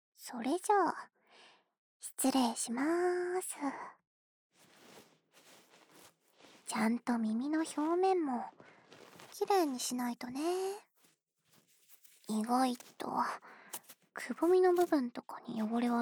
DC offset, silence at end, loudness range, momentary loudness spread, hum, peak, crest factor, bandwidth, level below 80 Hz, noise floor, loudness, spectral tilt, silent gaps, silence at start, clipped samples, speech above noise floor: under 0.1%; 0 s; 6 LU; 17 LU; none; -18 dBFS; 18 dB; over 20 kHz; -88 dBFS; -73 dBFS; -34 LUFS; -4 dB/octave; 1.78-2.00 s, 4.07-4.50 s; 0.2 s; under 0.1%; 39 dB